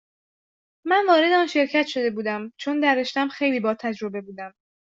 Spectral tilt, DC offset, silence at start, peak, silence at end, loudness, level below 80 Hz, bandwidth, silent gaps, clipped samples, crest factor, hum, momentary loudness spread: -4.5 dB/octave; under 0.1%; 0.85 s; -4 dBFS; 0.45 s; -22 LUFS; -72 dBFS; 7.8 kHz; none; under 0.1%; 18 dB; none; 17 LU